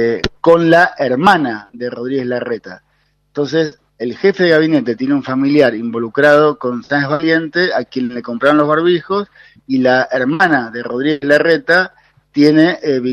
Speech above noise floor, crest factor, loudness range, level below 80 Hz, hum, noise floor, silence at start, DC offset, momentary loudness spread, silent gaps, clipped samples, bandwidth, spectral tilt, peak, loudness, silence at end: 46 dB; 14 dB; 3 LU; -48 dBFS; none; -60 dBFS; 0 s; under 0.1%; 11 LU; none; under 0.1%; 10.5 kHz; -6.5 dB/octave; 0 dBFS; -14 LUFS; 0 s